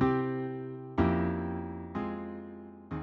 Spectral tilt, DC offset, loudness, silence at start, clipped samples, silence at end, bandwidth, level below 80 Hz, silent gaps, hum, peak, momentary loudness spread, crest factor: -10 dB/octave; under 0.1%; -34 LUFS; 0 s; under 0.1%; 0 s; 6 kHz; -50 dBFS; none; none; -12 dBFS; 14 LU; 20 dB